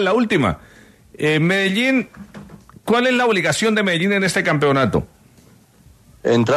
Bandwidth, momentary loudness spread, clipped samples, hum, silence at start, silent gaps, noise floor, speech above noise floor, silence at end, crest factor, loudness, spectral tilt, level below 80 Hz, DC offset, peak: 13.5 kHz; 17 LU; under 0.1%; none; 0 s; none; -50 dBFS; 33 dB; 0 s; 14 dB; -17 LUFS; -5 dB/octave; -48 dBFS; under 0.1%; -4 dBFS